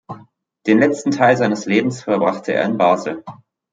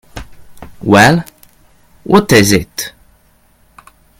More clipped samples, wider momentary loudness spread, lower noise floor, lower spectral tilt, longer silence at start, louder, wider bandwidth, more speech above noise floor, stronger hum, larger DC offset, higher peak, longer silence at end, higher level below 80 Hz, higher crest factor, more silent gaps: second, under 0.1% vs 0.4%; second, 13 LU vs 25 LU; second, -47 dBFS vs -51 dBFS; first, -6 dB/octave vs -4.5 dB/octave; about the same, 0.1 s vs 0.15 s; second, -17 LUFS vs -10 LUFS; second, 9.2 kHz vs 17.5 kHz; second, 31 dB vs 41 dB; neither; neither; about the same, -2 dBFS vs 0 dBFS; second, 0.4 s vs 1.3 s; second, -64 dBFS vs -38 dBFS; about the same, 16 dB vs 14 dB; neither